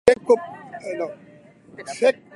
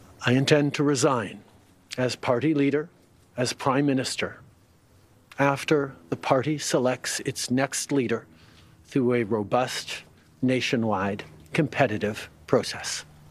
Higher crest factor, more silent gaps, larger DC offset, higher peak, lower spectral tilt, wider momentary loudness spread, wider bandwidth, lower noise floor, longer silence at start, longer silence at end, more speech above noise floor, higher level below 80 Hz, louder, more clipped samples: about the same, 22 dB vs 22 dB; neither; neither; about the same, -2 dBFS vs -4 dBFS; about the same, -4 dB/octave vs -5 dB/octave; first, 19 LU vs 11 LU; second, 11.5 kHz vs 14.5 kHz; second, -48 dBFS vs -58 dBFS; second, 0.05 s vs 0.2 s; about the same, 0.25 s vs 0.25 s; second, 26 dB vs 33 dB; first, -58 dBFS vs -64 dBFS; first, -22 LUFS vs -25 LUFS; neither